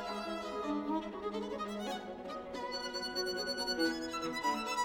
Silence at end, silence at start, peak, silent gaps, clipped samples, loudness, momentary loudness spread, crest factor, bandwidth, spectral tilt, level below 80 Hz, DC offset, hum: 0 s; 0 s; -20 dBFS; none; under 0.1%; -38 LUFS; 7 LU; 16 dB; 19 kHz; -3 dB/octave; -64 dBFS; under 0.1%; none